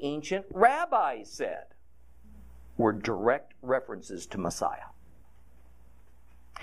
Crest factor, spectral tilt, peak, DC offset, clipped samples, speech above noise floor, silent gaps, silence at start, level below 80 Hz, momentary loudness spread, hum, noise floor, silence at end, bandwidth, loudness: 24 dB; -5 dB/octave; -8 dBFS; 0.3%; under 0.1%; 30 dB; none; 0 s; -58 dBFS; 19 LU; none; -60 dBFS; 0 s; 14 kHz; -29 LUFS